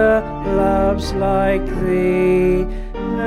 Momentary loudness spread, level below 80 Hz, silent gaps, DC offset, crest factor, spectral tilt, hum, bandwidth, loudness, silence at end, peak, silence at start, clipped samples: 6 LU; -28 dBFS; none; under 0.1%; 12 dB; -7.5 dB/octave; none; 12.5 kHz; -18 LUFS; 0 s; -4 dBFS; 0 s; under 0.1%